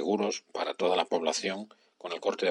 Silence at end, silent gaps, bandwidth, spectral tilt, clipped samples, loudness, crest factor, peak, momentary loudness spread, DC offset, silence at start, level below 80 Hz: 0 s; none; 11.5 kHz; -3 dB/octave; under 0.1%; -31 LUFS; 20 dB; -10 dBFS; 12 LU; under 0.1%; 0 s; -84 dBFS